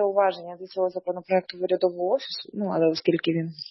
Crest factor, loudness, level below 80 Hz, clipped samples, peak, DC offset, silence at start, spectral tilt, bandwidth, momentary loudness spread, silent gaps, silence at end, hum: 18 dB; -26 LUFS; -76 dBFS; under 0.1%; -8 dBFS; under 0.1%; 0 s; -7.5 dB/octave; 6 kHz; 9 LU; none; 0 s; none